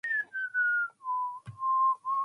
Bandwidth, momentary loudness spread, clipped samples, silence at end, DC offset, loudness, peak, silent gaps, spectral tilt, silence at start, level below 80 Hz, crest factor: 10.5 kHz; 7 LU; under 0.1%; 0 s; under 0.1%; -30 LUFS; -20 dBFS; none; -4 dB/octave; 0.05 s; -76 dBFS; 10 dB